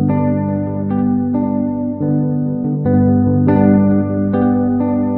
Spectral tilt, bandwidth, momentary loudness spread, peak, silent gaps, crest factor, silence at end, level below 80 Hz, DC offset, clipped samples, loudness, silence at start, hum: -14.5 dB/octave; 2.9 kHz; 7 LU; 0 dBFS; none; 14 dB; 0 s; -44 dBFS; under 0.1%; under 0.1%; -15 LUFS; 0 s; 50 Hz at -25 dBFS